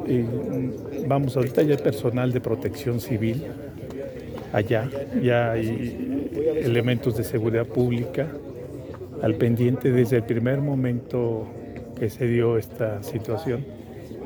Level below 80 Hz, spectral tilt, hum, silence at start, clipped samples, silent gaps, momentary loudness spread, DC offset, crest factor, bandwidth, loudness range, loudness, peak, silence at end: -50 dBFS; -8 dB/octave; none; 0 s; under 0.1%; none; 14 LU; under 0.1%; 18 dB; over 20 kHz; 3 LU; -25 LUFS; -6 dBFS; 0 s